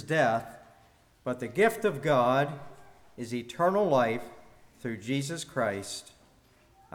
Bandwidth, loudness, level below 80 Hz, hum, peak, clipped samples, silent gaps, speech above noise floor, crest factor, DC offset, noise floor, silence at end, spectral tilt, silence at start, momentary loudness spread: 20 kHz; -29 LUFS; -66 dBFS; none; -12 dBFS; under 0.1%; none; 33 dB; 20 dB; under 0.1%; -62 dBFS; 0.95 s; -5.5 dB/octave; 0 s; 16 LU